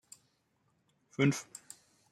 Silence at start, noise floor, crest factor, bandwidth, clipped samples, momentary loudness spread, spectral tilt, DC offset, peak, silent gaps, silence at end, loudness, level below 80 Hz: 1.2 s; -76 dBFS; 22 dB; 15 kHz; under 0.1%; 23 LU; -5.5 dB/octave; under 0.1%; -16 dBFS; none; 0.7 s; -32 LUFS; -76 dBFS